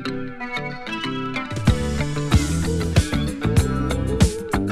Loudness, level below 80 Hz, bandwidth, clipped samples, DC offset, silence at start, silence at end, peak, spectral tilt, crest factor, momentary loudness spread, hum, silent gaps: -22 LUFS; -28 dBFS; 15 kHz; under 0.1%; under 0.1%; 0 s; 0 s; -2 dBFS; -5.5 dB/octave; 18 dB; 8 LU; none; none